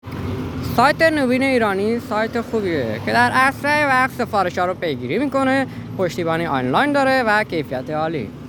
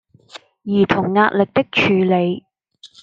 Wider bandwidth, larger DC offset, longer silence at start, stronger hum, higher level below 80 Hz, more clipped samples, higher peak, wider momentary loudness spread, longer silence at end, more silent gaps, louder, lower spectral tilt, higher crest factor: first, 20 kHz vs 7.6 kHz; neither; second, 0.05 s vs 0.35 s; neither; first, -48 dBFS vs -56 dBFS; neither; about the same, 0 dBFS vs -2 dBFS; about the same, 9 LU vs 8 LU; second, 0 s vs 0.15 s; neither; about the same, -19 LUFS vs -17 LUFS; second, -5.5 dB/octave vs -7 dB/octave; about the same, 18 dB vs 16 dB